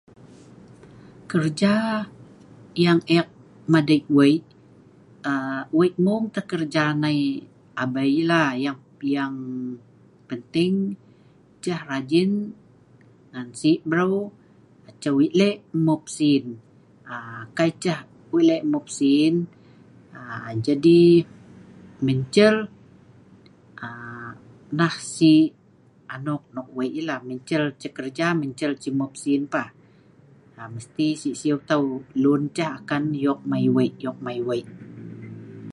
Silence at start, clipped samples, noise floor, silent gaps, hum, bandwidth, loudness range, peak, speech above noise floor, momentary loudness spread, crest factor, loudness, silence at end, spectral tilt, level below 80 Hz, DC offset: 0.25 s; under 0.1%; -55 dBFS; none; none; 11 kHz; 6 LU; -2 dBFS; 33 dB; 18 LU; 20 dB; -22 LUFS; 0 s; -6 dB/octave; -66 dBFS; under 0.1%